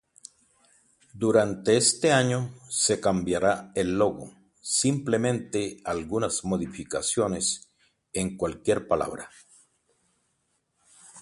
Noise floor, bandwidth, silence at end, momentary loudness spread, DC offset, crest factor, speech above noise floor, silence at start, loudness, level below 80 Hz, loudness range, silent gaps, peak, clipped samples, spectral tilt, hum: -74 dBFS; 11.5 kHz; 0 s; 11 LU; under 0.1%; 20 dB; 48 dB; 1.15 s; -26 LUFS; -56 dBFS; 7 LU; none; -8 dBFS; under 0.1%; -4 dB/octave; none